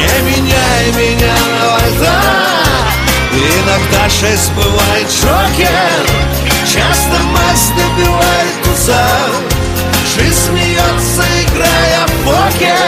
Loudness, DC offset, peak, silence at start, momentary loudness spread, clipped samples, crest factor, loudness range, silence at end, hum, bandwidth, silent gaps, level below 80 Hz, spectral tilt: -10 LUFS; under 0.1%; 0 dBFS; 0 s; 2 LU; under 0.1%; 10 dB; 1 LU; 0 s; none; 16 kHz; none; -20 dBFS; -3.5 dB/octave